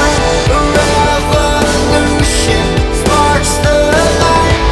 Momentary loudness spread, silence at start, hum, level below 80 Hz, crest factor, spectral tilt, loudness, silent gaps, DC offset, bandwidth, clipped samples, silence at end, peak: 2 LU; 0 s; none; -18 dBFS; 10 dB; -4.5 dB/octave; -10 LUFS; none; under 0.1%; 12 kHz; under 0.1%; 0 s; 0 dBFS